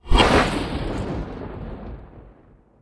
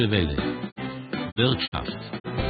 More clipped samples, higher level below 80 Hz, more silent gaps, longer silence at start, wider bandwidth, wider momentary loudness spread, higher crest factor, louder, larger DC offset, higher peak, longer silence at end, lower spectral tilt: neither; first, -28 dBFS vs -42 dBFS; second, none vs 0.72-0.76 s, 1.32-1.36 s, 1.68-1.72 s, 2.20-2.24 s; about the same, 0.05 s vs 0 s; first, 11 kHz vs 5.2 kHz; first, 21 LU vs 10 LU; about the same, 22 dB vs 20 dB; first, -22 LUFS vs -27 LUFS; neither; first, 0 dBFS vs -6 dBFS; first, 0.55 s vs 0 s; second, -5 dB/octave vs -10.5 dB/octave